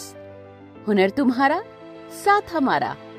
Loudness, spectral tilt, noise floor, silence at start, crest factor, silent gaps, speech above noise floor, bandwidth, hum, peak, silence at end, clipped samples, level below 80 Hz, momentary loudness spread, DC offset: -21 LUFS; -5.5 dB/octave; -43 dBFS; 0 s; 18 dB; none; 22 dB; 16 kHz; none; -6 dBFS; 0 s; under 0.1%; -60 dBFS; 21 LU; under 0.1%